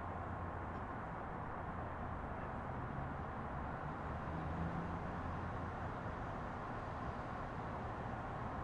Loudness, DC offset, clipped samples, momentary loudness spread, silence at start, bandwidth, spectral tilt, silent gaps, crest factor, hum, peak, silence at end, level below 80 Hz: -45 LUFS; under 0.1%; under 0.1%; 2 LU; 0 s; 10.5 kHz; -8 dB/octave; none; 16 dB; none; -28 dBFS; 0 s; -54 dBFS